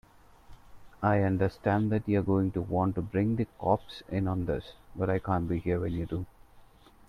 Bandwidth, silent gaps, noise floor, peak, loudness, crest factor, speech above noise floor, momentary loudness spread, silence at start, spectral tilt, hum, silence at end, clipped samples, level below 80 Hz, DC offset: 6 kHz; none; -56 dBFS; -12 dBFS; -30 LUFS; 18 dB; 27 dB; 8 LU; 0.5 s; -9.5 dB/octave; none; 0.5 s; under 0.1%; -52 dBFS; under 0.1%